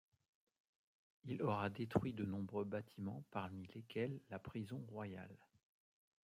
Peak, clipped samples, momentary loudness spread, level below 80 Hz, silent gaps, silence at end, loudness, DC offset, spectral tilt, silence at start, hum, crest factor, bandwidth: -22 dBFS; under 0.1%; 10 LU; -76 dBFS; none; 0.9 s; -46 LUFS; under 0.1%; -8 dB/octave; 1.25 s; none; 26 dB; 15.5 kHz